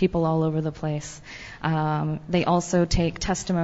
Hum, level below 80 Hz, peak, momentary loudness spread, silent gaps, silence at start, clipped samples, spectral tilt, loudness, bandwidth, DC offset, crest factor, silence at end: none; -38 dBFS; -8 dBFS; 10 LU; none; 0 s; under 0.1%; -6 dB/octave; -25 LUFS; 8 kHz; under 0.1%; 16 dB; 0 s